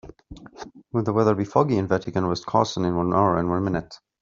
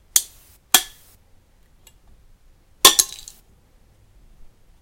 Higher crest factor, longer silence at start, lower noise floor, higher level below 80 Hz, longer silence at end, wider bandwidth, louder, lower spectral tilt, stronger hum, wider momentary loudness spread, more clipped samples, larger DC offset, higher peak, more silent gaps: about the same, 20 dB vs 24 dB; about the same, 0.05 s vs 0.15 s; second, -44 dBFS vs -54 dBFS; about the same, -52 dBFS vs -52 dBFS; second, 0.25 s vs 1.75 s; second, 7.6 kHz vs 17 kHz; second, -23 LUFS vs -16 LUFS; first, -6.5 dB/octave vs 1.5 dB/octave; neither; second, 9 LU vs 26 LU; neither; neither; second, -4 dBFS vs 0 dBFS; neither